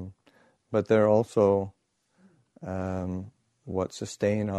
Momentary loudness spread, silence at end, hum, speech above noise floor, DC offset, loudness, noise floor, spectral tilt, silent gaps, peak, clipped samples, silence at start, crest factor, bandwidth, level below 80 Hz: 17 LU; 0 s; none; 39 dB; under 0.1%; -27 LUFS; -65 dBFS; -7 dB/octave; none; -10 dBFS; under 0.1%; 0 s; 18 dB; 11.5 kHz; -62 dBFS